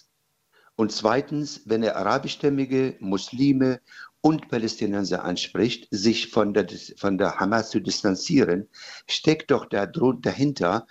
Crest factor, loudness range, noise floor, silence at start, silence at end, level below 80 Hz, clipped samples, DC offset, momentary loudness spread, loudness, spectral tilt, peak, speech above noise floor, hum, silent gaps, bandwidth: 20 dB; 1 LU; -71 dBFS; 0.8 s; 0.1 s; -60 dBFS; under 0.1%; under 0.1%; 7 LU; -24 LUFS; -5.5 dB/octave; -4 dBFS; 47 dB; none; none; 8.2 kHz